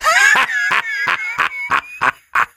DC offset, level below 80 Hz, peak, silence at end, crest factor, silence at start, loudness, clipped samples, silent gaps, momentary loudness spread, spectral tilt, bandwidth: under 0.1%; -54 dBFS; 0 dBFS; 0.1 s; 16 dB; 0 s; -15 LUFS; under 0.1%; none; 9 LU; 0 dB/octave; 17 kHz